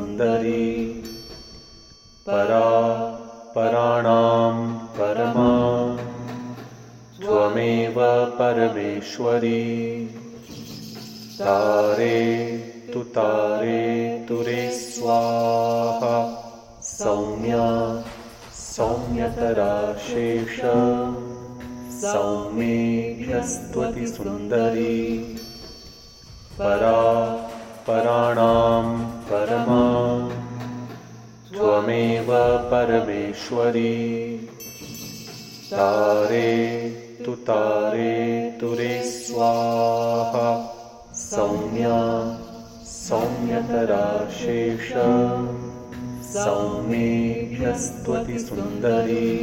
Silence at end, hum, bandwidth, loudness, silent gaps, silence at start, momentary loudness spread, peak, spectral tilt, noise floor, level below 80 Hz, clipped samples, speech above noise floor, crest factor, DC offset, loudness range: 0 s; none; 16.5 kHz; -22 LUFS; none; 0 s; 17 LU; -4 dBFS; -6 dB/octave; -48 dBFS; -48 dBFS; under 0.1%; 27 dB; 18 dB; under 0.1%; 4 LU